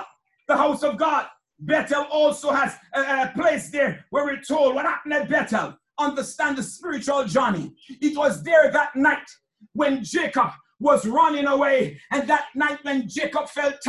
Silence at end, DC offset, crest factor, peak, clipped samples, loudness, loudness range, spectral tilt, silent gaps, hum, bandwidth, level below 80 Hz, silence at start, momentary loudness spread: 0 s; under 0.1%; 18 dB; -4 dBFS; under 0.1%; -22 LUFS; 3 LU; -4.5 dB/octave; none; none; 12.5 kHz; -64 dBFS; 0 s; 8 LU